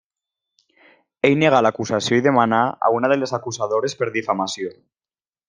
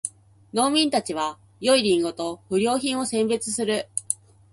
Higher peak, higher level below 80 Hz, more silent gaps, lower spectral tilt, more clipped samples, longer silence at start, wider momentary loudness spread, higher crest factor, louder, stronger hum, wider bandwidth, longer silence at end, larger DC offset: about the same, -2 dBFS vs -2 dBFS; about the same, -62 dBFS vs -64 dBFS; neither; first, -5 dB/octave vs -3 dB/octave; neither; first, 1.25 s vs 0.05 s; about the same, 9 LU vs 10 LU; about the same, 20 dB vs 22 dB; first, -19 LUFS vs -24 LUFS; neither; second, 10 kHz vs 11.5 kHz; first, 0.75 s vs 0.4 s; neither